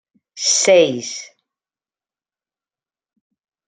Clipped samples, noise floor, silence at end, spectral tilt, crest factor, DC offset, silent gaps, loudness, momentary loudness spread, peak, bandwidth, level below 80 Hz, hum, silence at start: under 0.1%; under -90 dBFS; 2.45 s; -1.5 dB/octave; 20 dB; under 0.1%; none; -15 LUFS; 17 LU; -2 dBFS; 10 kHz; -72 dBFS; none; 0.35 s